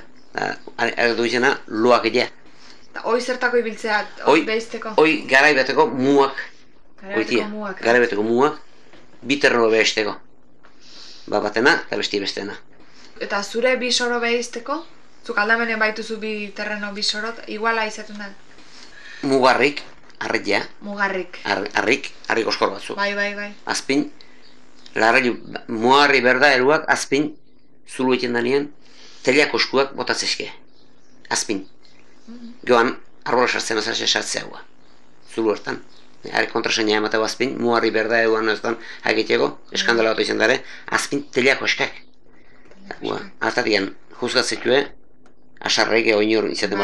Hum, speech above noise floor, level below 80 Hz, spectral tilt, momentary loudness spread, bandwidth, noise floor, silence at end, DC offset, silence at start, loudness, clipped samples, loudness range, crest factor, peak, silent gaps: none; 35 dB; -62 dBFS; -3 dB/octave; 14 LU; 12.5 kHz; -54 dBFS; 0 s; 1%; 0.35 s; -20 LUFS; under 0.1%; 5 LU; 20 dB; -2 dBFS; none